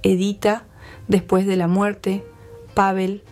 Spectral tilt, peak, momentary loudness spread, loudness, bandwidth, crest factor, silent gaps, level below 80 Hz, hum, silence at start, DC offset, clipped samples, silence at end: -6.5 dB/octave; -4 dBFS; 8 LU; -20 LUFS; 14.5 kHz; 16 dB; none; -48 dBFS; none; 0 s; under 0.1%; under 0.1%; 0.1 s